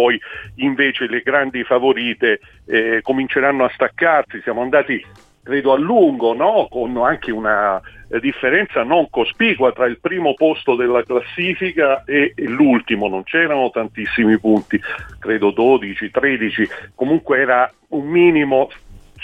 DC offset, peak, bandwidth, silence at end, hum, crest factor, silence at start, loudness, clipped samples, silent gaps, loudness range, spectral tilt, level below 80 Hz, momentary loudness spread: under 0.1%; -2 dBFS; 4.9 kHz; 0 s; none; 14 dB; 0 s; -17 LUFS; under 0.1%; none; 1 LU; -7 dB/octave; -50 dBFS; 8 LU